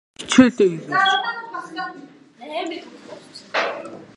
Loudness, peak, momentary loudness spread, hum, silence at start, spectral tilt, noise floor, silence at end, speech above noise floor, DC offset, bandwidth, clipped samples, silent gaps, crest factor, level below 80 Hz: -20 LUFS; 0 dBFS; 22 LU; none; 0.2 s; -4 dB/octave; -43 dBFS; 0.15 s; 24 dB; under 0.1%; 10.5 kHz; under 0.1%; none; 22 dB; -60 dBFS